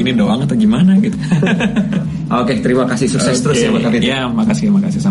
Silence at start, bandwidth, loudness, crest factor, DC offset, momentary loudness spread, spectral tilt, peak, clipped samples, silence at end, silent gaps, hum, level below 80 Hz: 0 s; 11.5 kHz; -14 LUFS; 10 dB; under 0.1%; 4 LU; -6 dB/octave; -2 dBFS; under 0.1%; 0 s; none; none; -40 dBFS